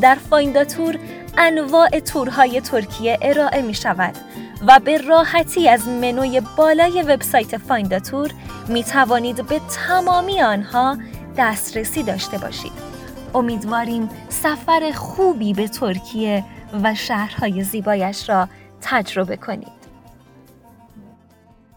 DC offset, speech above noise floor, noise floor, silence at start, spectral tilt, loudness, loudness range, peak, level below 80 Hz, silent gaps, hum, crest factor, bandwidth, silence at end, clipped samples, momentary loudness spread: under 0.1%; 33 dB; -51 dBFS; 0 s; -4 dB/octave; -18 LUFS; 7 LU; 0 dBFS; -44 dBFS; none; none; 18 dB; over 20 kHz; 0.75 s; under 0.1%; 12 LU